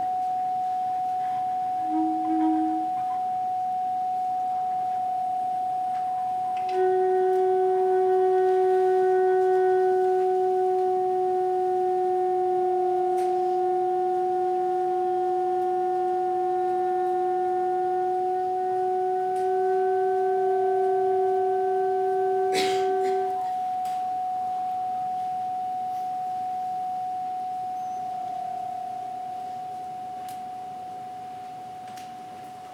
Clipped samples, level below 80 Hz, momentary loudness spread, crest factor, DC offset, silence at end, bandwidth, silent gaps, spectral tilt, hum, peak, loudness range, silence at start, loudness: under 0.1%; -76 dBFS; 12 LU; 12 dB; under 0.1%; 0 s; 11 kHz; none; -5.5 dB/octave; none; -12 dBFS; 10 LU; 0 s; -25 LUFS